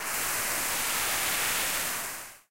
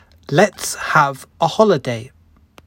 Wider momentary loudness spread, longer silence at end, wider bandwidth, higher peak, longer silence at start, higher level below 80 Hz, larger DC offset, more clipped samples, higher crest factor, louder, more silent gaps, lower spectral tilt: about the same, 7 LU vs 9 LU; second, 0 s vs 0.6 s; about the same, 16 kHz vs 16.5 kHz; second, -16 dBFS vs 0 dBFS; second, 0 s vs 0.3 s; about the same, -56 dBFS vs -56 dBFS; first, 0.3% vs under 0.1%; neither; about the same, 16 dB vs 18 dB; second, -27 LUFS vs -17 LUFS; neither; second, 0.5 dB/octave vs -4.5 dB/octave